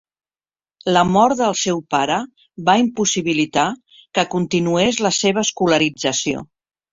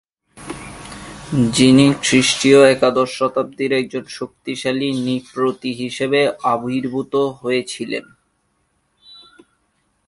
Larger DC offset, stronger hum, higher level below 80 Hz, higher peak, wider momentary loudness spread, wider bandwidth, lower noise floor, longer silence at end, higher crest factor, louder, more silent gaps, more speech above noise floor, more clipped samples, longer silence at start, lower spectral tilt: neither; neither; about the same, -54 dBFS vs -52 dBFS; about the same, -2 dBFS vs 0 dBFS; second, 8 LU vs 21 LU; second, 7.8 kHz vs 11.5 kHz; first, under -90 dBFS vs -66 dBFS; second, 0.5 s vs 2.05 s; about the same, 18 dB vs 18 dB; about the same, -18 LUFS vs -17 LUFS; neither; first, over 72 dB vs 49 dB; neither; first, 0.85 s vs 0.35 s; about the same, -3.5 dB/octave vs -4.5 dB/octave